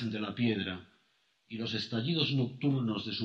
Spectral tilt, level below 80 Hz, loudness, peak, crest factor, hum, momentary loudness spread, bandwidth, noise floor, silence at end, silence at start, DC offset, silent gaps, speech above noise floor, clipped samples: -7 dB/octave; -72 dBFS; -33 LUFS; -16 dBFS; 18 dB; none; 9 LU; 7.4 kHz; -73 dBFS; 0 s; 0 s; under 0.1%; none; 40 dB; under 0.1%